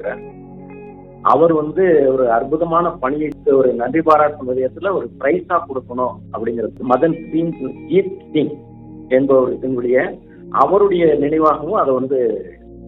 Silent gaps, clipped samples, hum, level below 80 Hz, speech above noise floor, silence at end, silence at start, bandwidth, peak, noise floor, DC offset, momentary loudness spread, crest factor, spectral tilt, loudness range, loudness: none; under 0.1%; none; -48 dBFS; 20 dB; 0 s; 0 s; 5.2 kHz; 0 dBFS; -36 dBFS; under 0.1%; 14 LU; 16 dB; -9.5 dB/octave; 4 LU; -16 LUFS